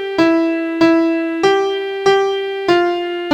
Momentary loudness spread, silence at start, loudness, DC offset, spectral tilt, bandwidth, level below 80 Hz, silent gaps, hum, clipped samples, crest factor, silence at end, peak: 5 LU; 0 s; -15 LUFS; under 0.1%; -4.5 dB/octave; 8.8 kHz; -56 dBFS; none; none; under 0.1%; 14 dB; 0 s; 0 dBFS